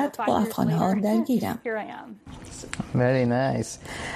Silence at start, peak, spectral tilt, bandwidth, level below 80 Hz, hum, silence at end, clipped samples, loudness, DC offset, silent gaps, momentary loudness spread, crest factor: 0 s; -8 dBFS; -6.5 dB/octave; 15 kHz; -52 dBFS; none; 0 s; under 0.1%; -25 LUFS; under 0.1%; none; 18 LU; 16 dB